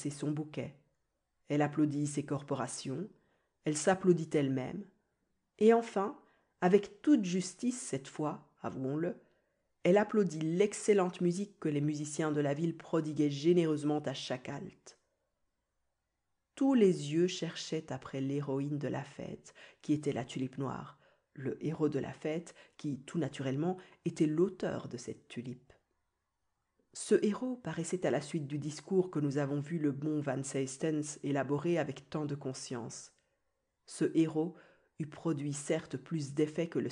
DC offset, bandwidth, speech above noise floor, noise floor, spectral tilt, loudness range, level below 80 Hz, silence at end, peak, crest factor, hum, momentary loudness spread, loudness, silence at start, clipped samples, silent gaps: under 0.1%; 10.5 kHz; 50 dB; -84 dBFS; -6 dB/octave; 6 LU; -76 dBFS; 0 s; -14 dBFS; 20 dB; none; 14 LU; -34 LUFS; 0 s; under 0.1%; none